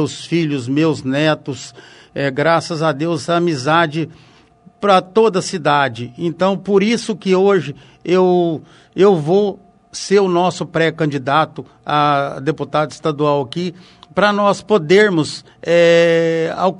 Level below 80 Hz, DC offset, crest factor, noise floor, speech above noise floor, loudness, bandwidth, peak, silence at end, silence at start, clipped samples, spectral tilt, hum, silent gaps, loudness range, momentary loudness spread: -58 dBFS; under 0.1%; 16 dB; -48 dBFS; 32 dB; -16 LUFS; 11 kHz; 0 dBFS; 0 s; 0 s; under 0.1%; -5.5 dB/octave; none; none; 3 LU; 12 LU